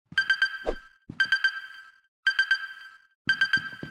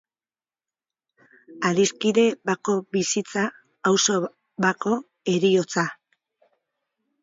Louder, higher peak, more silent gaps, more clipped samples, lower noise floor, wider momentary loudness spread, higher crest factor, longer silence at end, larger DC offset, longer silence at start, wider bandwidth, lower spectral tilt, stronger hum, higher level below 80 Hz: second, -26 LUFS vs -23 LUFS; second, -12 dBFS vs -4 dBFS; first, 2.08-2.23 s, 3.15-3.25 s vs none; neither; second, -46 dBFS vs under -90 dBFS; first, 16 LU vs 7 LU; about the same, 16 dB vs 20 dB; second, 0 s vs 1.3 s; neither; second, 0.15 s vs 1.5 s; first, 13.5 kHz vs 7.8 kHz; second, -2 dB/octave vs -4 dB/octave; neither; first, -50 dBFS vs -70 dBFS